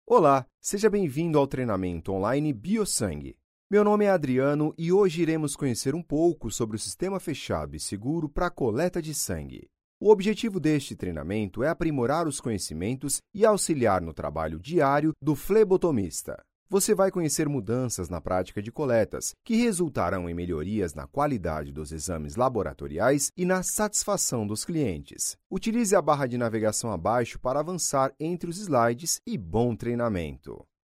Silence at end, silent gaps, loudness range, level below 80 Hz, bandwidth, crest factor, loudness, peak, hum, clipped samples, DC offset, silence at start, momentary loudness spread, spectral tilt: 0.3 s; 0.54-0.58 s, 3.44-3.70 s, 9.84-10.01 s, 16.55-16.66 s, 25.46-25.50 s; 4 LU; -48 dBFS; 16 kHz; 20 dB; -26 LUFS; -6 dBFS; none; under 0.1%; under 0.1%; 0.1 s; 10 LU; -5 dB/octave